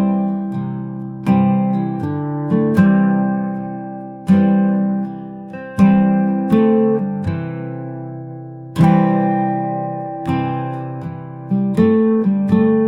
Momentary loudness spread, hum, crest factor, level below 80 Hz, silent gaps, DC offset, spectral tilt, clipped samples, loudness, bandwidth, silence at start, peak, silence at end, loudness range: 15 LU; none; 16 dB; -52 dBFS; none; 0.1%; -10 dB/octave; under 0.1%; -17 LUFS; 5.4 kHz; 0 s; -2 dBFS; 0 s; 3 LU